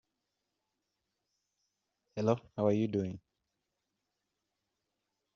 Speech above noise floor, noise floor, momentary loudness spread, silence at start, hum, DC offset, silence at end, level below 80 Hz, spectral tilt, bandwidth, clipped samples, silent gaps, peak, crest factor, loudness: 54 dB; -86 dBFS; 14 LU; 2.15 s; 50 Hz at -65 dBFS; under 0.1%; 2.2 s; -74 dBFS; -8 dB/octave; 7.2 kHz; under 0.1%; none; -14 dBFS; 26 dB; -33 LUFS